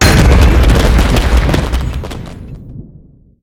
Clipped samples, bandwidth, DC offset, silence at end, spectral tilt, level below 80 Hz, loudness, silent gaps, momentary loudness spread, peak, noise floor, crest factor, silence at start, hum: 0.4%; 17 kHz; under 0.1%; 0.6 s; -5.5 dB/octave; -12 dBFS; -11 LUFS; none; 22 LU; 0 dBFS; -40 dBFS; 10 dB; 0 s; none